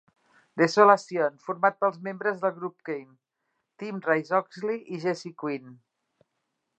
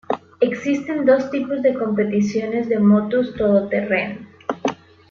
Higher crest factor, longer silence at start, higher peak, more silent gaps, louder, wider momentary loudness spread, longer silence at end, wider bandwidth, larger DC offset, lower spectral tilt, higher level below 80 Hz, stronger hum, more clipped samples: first, 24 dB vs 16 dB; first, 0.55 s vs 0.1 s; about the same, -4 dBFS vs -4 dBFS; neither; second, -26 LUFS vs -20 LUFS; first, 17 LU vs 10 LU; first, 1.05 s vs 0.35 s; first, 8.8 kHz vs 7 kHz; neither; second, -5.5 dB/octave vs -7 dB/octave; second, -84 dBFS vs -56 dBFS; neither; neither